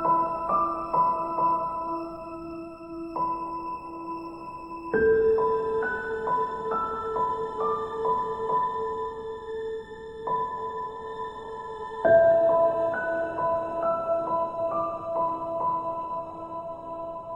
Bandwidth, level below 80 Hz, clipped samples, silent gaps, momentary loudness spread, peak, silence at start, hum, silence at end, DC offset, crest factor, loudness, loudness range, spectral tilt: 8.4 kHz; -56 dBFS; under 0.1%; none; 15 LU; -10 dBFS; 0 s; none; 0 s; under 0.1%; 18 dB; -27 LUFS; 7 LU; -7.5 dB/octave